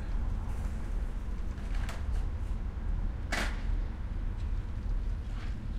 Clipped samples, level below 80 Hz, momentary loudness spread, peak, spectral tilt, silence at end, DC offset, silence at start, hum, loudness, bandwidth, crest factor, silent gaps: under 0.1%; -34 dBFS; 5 LU; -18 dBFS; -5.5 dB/octave; 0 s; under 0.1%; 0 s; none; -38 LUFS; 11.5 kHz; 16 dB; none